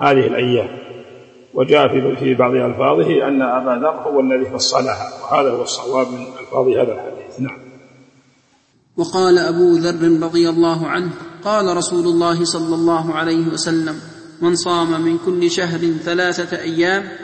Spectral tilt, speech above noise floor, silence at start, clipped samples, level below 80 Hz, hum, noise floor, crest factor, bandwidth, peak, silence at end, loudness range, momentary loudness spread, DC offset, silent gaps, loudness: -5 dB/octave; 41 dB; 0 s; under 0.1%; -60 dBFS; none; -57 dBFS; 16 dB; 8.8 kHz; 0 dBFS; 0 s; 4 LU; 13 LU; under 0.1%; none; -17 LUFS